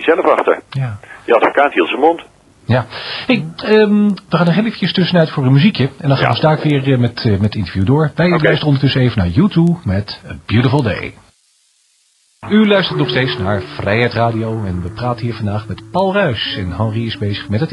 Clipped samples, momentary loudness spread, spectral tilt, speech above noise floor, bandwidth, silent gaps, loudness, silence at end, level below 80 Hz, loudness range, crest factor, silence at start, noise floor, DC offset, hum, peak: under 0.1%; 9 LU; -8 dB/octave; 43 dB; 11 kHz; none; -15 LUFS; 0 s; -44 dBFS; 4 LU; 14 dB; 0 s; -57 dBFS; under 0.1%; none; 0 dBFS